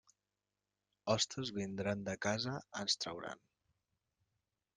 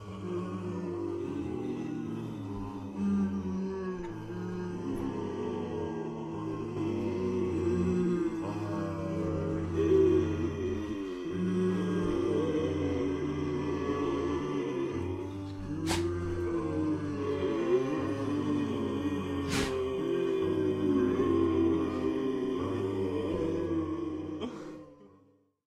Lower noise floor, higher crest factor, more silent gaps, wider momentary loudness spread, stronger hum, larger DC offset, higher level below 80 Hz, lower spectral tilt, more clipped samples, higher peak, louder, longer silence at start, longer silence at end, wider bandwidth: first, under -90 dBFS vs -65 dBFS; first, 24 dB vs 16 dB; neither; first, 12 LU vs 9 LU; first, 50 Hz at -60 dBFS vs none; neither; second, -74 dBFS vs -56 dBFS; second, -3.5 dB/octave vs -7 dB/octave; neither; second, -20 dBFS vs -16 dBFS; second, -39 LUFS vs -32 LUFS; first, 1.05 s vs 0 s; first, 1.4 s vs 0.6 s; second, 10 kHz vs 13 kHz